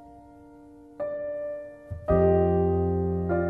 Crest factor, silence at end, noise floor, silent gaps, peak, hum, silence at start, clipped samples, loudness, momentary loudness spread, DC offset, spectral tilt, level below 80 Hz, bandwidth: 16 dB; 0 s; -49 dBFS; none; -10 dBFS; none; 0 s; under 0.1%; -26 LUFS; 15 LU; under 0.1%; -11.5 dB/octave; -42 dBFS; 3.3 kHz